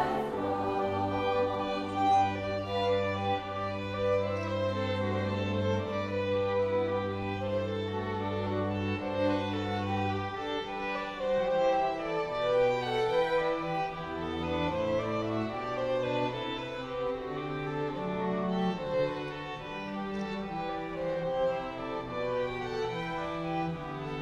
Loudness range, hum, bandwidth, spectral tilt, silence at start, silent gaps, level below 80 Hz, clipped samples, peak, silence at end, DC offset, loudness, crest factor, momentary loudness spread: 4 LU; none; 9.4 kHz; -7 dB/octave; 0 s; none; -56 dBFS; under 0.1%; -16 dBFS; 0 s; under 0.1%; -32 LUFS; 14 dB; 7 LU